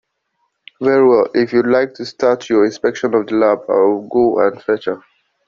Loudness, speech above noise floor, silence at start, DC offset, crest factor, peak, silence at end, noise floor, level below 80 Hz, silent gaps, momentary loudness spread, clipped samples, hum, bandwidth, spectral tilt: -15 LUFS; 54 dB; 0.8 s; under 0.1%; 14 dB; -2 dBFS; 0.5 s; -68 dBFS; -56 dBFS; none; 8 LU; under 0.1%; none; 7.4 kHz; -6 dB/octave